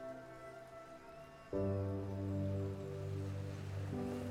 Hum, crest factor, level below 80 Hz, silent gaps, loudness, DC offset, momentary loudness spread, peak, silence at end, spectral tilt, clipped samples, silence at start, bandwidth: none; 14 dB; -64 dBFS; none; -43 LUFS; under 0.1%; 15 LU; -28 dBFS; 0 s; -8 dB/octave; under 0.1%; 0 s; 12.5 kHz